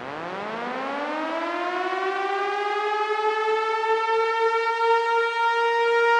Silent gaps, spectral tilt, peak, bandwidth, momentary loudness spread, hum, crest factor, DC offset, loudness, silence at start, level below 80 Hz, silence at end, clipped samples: none; -3 dB/octave; -8 dBFS; 10.5 kHz; 8 LU; none; 16 dB; under 0.1%; -24 LUFS; 0 s; -78 dBFS; 0 s; under 0.1%